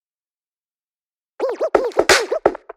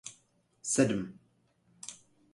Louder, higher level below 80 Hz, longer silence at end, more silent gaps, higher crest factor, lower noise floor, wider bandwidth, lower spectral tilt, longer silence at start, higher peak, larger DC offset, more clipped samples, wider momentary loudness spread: first, -18 LUFS vs -31 LUFS; first, -50 dBFS vs -68 dBFS; second, 0.2 s vs 0.4 s; neither; about the same, 20 dB vs 24 dB; first, under -90 dBFS vs -70 dBFS; first, 16.5 kHz vs 11.5 kHz; second, -1.5 dB/octave vs -4.5 dB/octave; first, 1.4 s vs 0.05 s; first, 0 dBFS vs -12 dBFS; neither; neither; second, 10 LU vs 19 LU